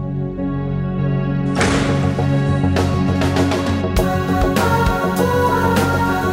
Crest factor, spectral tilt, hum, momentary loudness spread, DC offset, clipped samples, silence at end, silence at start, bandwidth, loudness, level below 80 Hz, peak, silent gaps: 14 dB; -6.5 dB/octave; none; 6 LU; under 0.1%; under 0.1%; 0 s; 0 s; 16.5 kHz; -17 LUFS; -30 dBFS; -2 dBFS; none